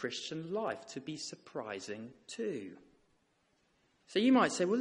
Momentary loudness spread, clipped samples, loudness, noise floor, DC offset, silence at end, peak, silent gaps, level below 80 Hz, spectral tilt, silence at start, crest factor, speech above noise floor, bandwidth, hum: 17 LU; under 0.1%; -35 LUFS; -75 dBFS; under 0.1%; 0 s; -14 dBFS; none; -80 dBFS; -4 dB/octave; 0 s; 22 dB; 40 dB; 11 kHz; none